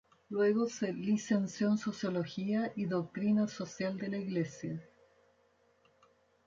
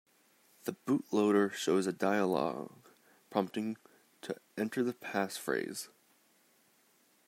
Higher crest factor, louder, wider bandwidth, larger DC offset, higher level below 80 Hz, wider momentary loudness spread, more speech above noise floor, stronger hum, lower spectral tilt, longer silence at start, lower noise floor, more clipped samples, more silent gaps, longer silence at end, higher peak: about the same, 16 dB vs 20 dB; about the same, -34 LUFS vs -34 LUFS; second, 7.6 kHz vs 16 kHz; neither; first, -74 dBFS vs -84 dBFS; second, 7 LU vs 14 LU; about the same, 37 dB vs 36 dB; neither; first, -6.5 dB/octave vs -5 dB/octave; second, 0.3 s vs 0.65 s; about the same, -70 dBFS vs -69 dBFS; neither; neither; first, 1.65 s vs 1.4 s; about the same, -18 dBFS vs -16 dBFS